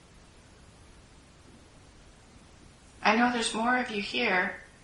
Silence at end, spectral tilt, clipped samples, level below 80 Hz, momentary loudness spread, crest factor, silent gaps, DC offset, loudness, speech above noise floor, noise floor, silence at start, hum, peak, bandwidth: 0.2 s; -3 dB/octave; under 0.1%; -60 dBFS; 5 LU; 24 dB; none; under 0.1%; -27 LUFS; 27 dB; -55 dBFS; 1.5 s; none; -8 dBFS; 11.5 kHz